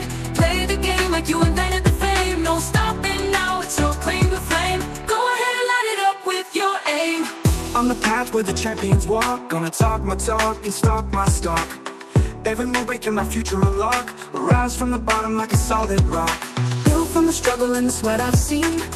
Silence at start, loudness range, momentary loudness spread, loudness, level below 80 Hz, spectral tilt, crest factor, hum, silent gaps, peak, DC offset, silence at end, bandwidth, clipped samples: 0 s; 2 LU; 4 LU; -20 LUFS; -28 dBFS; -4.5 dB/octave; 18 dB; none; none; -2 dBFS; under 0.1%; 0 s; 15 kHz; under 0.1%